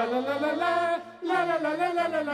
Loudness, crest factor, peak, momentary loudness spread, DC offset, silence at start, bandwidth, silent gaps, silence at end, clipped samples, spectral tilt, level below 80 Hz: -27 LUFS; 14 dB; -14 dBFS; 3 LU; under 0.1%; 0 s; 13 kHz; none; 0 s; under 0.1%; -4.5 dB/octave; -72 dBFS